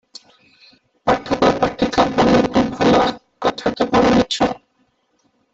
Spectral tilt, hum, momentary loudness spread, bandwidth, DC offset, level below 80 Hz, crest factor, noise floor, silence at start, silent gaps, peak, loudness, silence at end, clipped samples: -5.5 dB/octave; none; 8 LU; 8.2 kHz; under 0.1%; -42 dBFS; 16 dB; -64 dBFS; 1.05 s; none; -2 dBFS; -17 LUFS; 0.95 s; under 0.1%